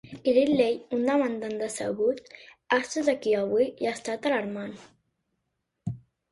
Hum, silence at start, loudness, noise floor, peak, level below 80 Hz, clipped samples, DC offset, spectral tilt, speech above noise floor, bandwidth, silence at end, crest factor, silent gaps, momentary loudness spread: none; 0.05 s; -27 LUFS; -80 dBFS; -8 dBFS; -66 dBFS; under 0.1%; under 0.1%; -5 dB/octave; 54 dB; 11.5 kHz; 0.35 s; 18 dB; none; 14 LU